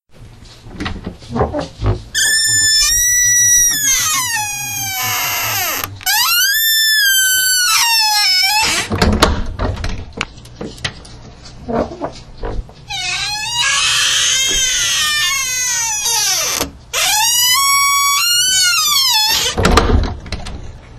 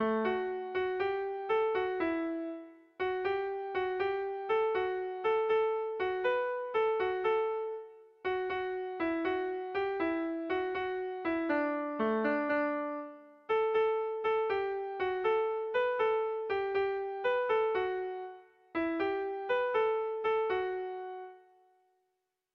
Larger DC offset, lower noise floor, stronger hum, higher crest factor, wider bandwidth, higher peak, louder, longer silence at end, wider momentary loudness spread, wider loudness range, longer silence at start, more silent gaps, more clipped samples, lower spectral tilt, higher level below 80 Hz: neither; second, -38 dBFS vs -83 dBFS; neither; about the same, 16 dB vs 14 dB; first, 16 kHz vs 5.8 kHz; first, 0 dBFS vs -20 dBFS; first, -12 LUFS vs -33 LUFS; second, 0 s vs 1.15 s; first, 16 LU vs 8 LU; first, 9 LU vs 2 LU; first, 0.2 s vs 0 s; neither; neither; second, -1 dB/octave vs -6.5 dB/octave; first, -28 dBFS vs -70 dBFS